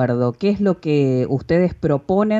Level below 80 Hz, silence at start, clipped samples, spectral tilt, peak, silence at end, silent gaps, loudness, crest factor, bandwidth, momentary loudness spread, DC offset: -46 dBFS; 0 s; under 0.1%; -9 dB/octave; -6 dBFS; 0 s; none; -19 LUFS; 12 dB; 7.8 kHz; 2 LU; under 0.1%